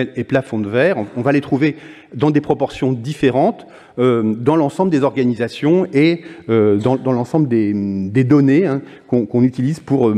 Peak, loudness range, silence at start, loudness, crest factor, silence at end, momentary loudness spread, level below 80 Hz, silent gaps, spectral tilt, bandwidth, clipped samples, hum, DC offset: 0 dBFS; 2 LU; 0 s; -16 LUFS; 14 dB; 0 s; 6 LU; -54 dBFS; none; -8 dB/octave; 10.5 kHz; under 0.1%; none; under 0.1%